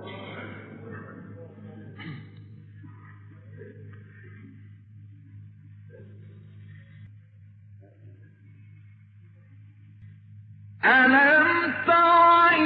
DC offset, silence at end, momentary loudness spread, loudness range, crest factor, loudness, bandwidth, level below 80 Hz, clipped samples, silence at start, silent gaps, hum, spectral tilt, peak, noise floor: under 0.1%; 0 s; 29 LU; 28 LU; 18 dB; -18 LUFS; 5.2 kHz; -72 dBFS; under 0.1%; 0 s; none; none; -8 dB/octave; -8 dBFS; -52 dBFS